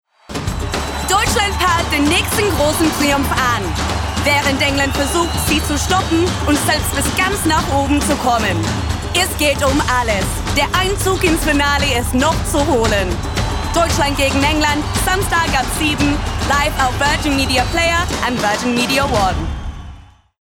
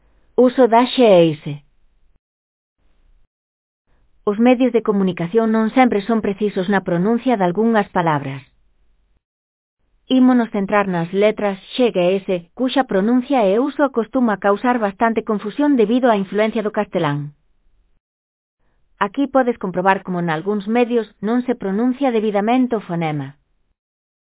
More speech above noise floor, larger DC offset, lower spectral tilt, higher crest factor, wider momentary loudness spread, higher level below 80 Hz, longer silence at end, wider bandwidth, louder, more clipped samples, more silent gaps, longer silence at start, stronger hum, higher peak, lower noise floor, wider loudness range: second, 23 dB vs 41 dB; neither; second, -4 dB/octave vs -10.5 dB/octave; second, 12 dB vs 18 dB; second, 5 LU vs 9 LU; first, -26 dBFS vs -58 dBFS; second, 0.4 s vs 1.05 s; first, 18 kHz vs 4 kHz; about the same, -16 LUFS vs -17 LUFS; neither; second, none vs 2.19-2.76 s, 3.27-3.85 s, 9.25-9.77 s, 18.00-18.57 s; about the same, 0.3 s vs 0.4 s; neither; second, -4 dBFS vs 0 dBFS; second, -39 dBFS vs -58 dBFS; second, 1 LU vs 5 LU